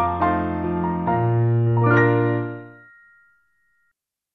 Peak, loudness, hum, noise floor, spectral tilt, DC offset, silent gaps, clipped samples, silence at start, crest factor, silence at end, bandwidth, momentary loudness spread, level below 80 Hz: -6 dBFS; -20 LUFS; none; -73 dBFS; -10.5 dB/octave; under 0.1%; none; under 0.1%; 0 s; 16 dB; 1.65 s; 4.1 kHz; 9 LU; -48 dBFS